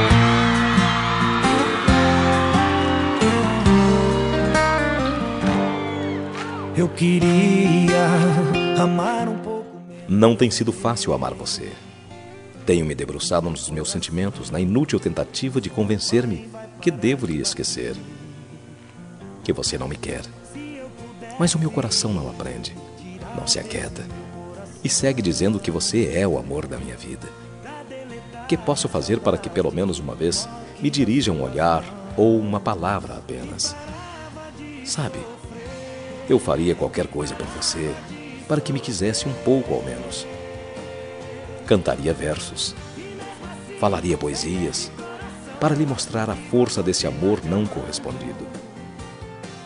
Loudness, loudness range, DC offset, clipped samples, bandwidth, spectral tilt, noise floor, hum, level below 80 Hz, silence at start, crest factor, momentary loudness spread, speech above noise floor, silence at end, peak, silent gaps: -21 LUFS; 8 LU; under 0.1%; under 0.1%; 11 kHz; -5 dB/octave; -42 dBFS; none; -40 dBFS; 0 s; 20 dB; 19 LU; 20 dB; 0 s; -2 dBFS; none